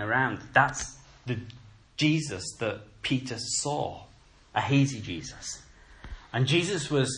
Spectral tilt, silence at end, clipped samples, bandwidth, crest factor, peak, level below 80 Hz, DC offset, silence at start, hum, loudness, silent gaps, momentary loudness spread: -4.5 dB/octave; 0 s; under 0.1%; 10.5 kHz; 24 dB; -6 dBFS; -54 dBFS; under 0.1%; 0 s; none; -29 LUFS; none; 17 LU